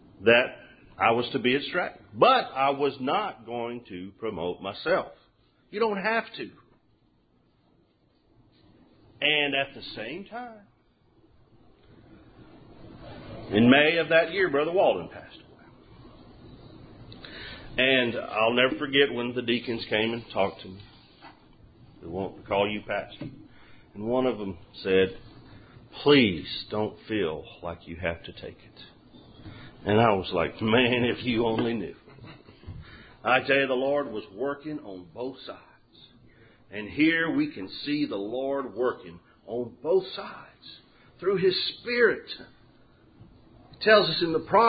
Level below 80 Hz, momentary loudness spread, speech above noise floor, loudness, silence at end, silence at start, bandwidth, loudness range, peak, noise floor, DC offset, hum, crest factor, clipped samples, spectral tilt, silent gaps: -56 dBFS; 22 LU; 39 dB; -26 LUFS; 0 s; 0.2 s; 5 kHz; 9 LU; -6 dBFS; -65 dBFS; under 0.1%; none; 22 dB; under 0.1%; -9.5 dB/octave; none